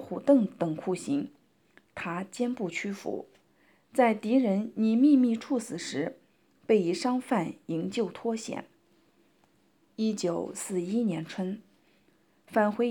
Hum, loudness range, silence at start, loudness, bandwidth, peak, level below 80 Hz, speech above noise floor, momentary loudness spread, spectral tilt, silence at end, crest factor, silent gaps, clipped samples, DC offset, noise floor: none; 7 LU; 0 s; -29 LUFS; 18 kHz; -10 dBFS; -80 dBFS; 39 dB; 13 LU; -6 dB/octave; 0 s; 18 dB; none; under 0.1%; under 0.1%; -67 dBFS